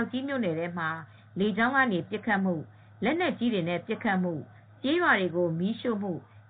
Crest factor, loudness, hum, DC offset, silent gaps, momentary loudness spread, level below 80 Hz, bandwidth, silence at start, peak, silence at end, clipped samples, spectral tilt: 18 dB; -28 LUFS; none; under 0.1%; none; 11 LU; -72 dBFS; 4.6 kHz; 0 s; -10 dBFS; 0.1 s; under 0.1%; -4.5 dB/octave